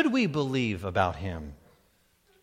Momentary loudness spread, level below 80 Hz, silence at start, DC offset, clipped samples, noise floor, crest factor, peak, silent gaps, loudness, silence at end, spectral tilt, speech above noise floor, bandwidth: 13 LU; -52 dBFS; 0 s; under 0.1%; under 0.1%; -66 dBFS; 22 dB; -8 dBFS; none; -28 LUFS; 0.85 s; -6.5 dB/octave; 38 dB; 14.5 kHz